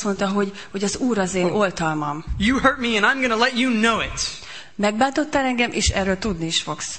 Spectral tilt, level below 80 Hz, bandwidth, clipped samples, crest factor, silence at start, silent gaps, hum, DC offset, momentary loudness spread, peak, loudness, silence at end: -3.5 dB/octave; -38 dBFS; 8.8 kHz; under 0.1%; 18 dB; 0 s; none; none; 0.6%; 8 LU; -2 dBFS; -21 LUFS; 0 s